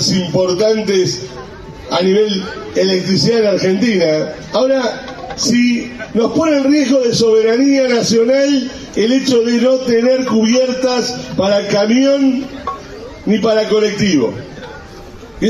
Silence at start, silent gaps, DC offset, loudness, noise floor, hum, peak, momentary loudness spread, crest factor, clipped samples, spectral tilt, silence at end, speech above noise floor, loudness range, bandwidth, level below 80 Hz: 0 s; none; under 0.1%; -14 LUFS; -33 dBFS; none; -4 dBFS; 14 LU; 10 dB; under 0.1%; -5 dB/octave; 0 s; 20 dB; 2 LU; 12.5 kHz; -44 dBFS